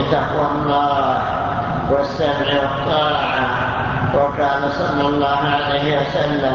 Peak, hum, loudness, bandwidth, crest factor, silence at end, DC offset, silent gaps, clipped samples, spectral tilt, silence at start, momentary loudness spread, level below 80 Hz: -2 dBFS; none; -18 LUFS; 7.2 kHz; 14 dB; 0 s; under 0.1%; none; under 0.1%; -6.5 dB/octave; 0 s; 3 LU; -38 dBFS